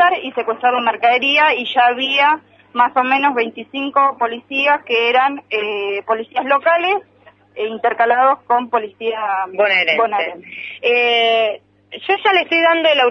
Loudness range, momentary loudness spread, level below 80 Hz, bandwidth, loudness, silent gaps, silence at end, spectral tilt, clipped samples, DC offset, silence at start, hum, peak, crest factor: 3 LU; 9 LU; -72 dBFS; 6.4 kHz; -16 LUFS; none; 0 s; -3.5 dB/octave; under 0.1%; under 0.1%; 0 s; 50 Hz at -60 dBFS; -2 dBFS; 16 dB